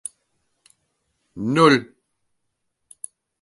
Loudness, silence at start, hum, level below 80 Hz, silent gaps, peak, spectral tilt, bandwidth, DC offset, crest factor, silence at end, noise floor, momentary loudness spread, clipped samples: -18 LUFS; 1.35 s; none; -64 dBFS; none; -2 dBFS; -5 dB/octave; 11.5 kHz; under 0.1%; 24 dB; 1.6 s; -75 dBFS; 23 LU; under 0.1%